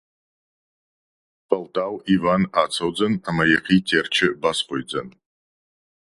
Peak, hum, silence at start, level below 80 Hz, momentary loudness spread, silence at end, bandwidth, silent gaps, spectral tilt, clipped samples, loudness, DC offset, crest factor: -2 dBFS; none; 1.5 s; -54 dBFS; 8 LU; 1 s; 11.5 kHz; none; -5 dB/octave; under 0.1%; -21 LUFS; under 0.1%; 20 dB